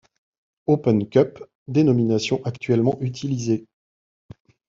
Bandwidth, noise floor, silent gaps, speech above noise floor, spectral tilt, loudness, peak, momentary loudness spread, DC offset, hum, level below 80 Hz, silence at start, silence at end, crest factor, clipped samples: 7.6 kHz; under -90 dBFS; 1.55-1.66 s; over 70 dB; -7 dB/octave; -22 LUFS; -4 dBFS; 8 LU; under 0.1%; none; -60 dBFS; 0.7 s; 1.05 s; 18 dB; under 0.1%